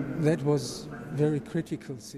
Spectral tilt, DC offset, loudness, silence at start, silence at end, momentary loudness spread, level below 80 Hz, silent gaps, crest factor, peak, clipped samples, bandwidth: -6.5 dB/octave; under 0.1%; -30 LUFS; 0 s; 0 s; 10 LU; -60 dBFS; none; 16 dB; -14 dBFS; under 0.1%; 13.5 kHz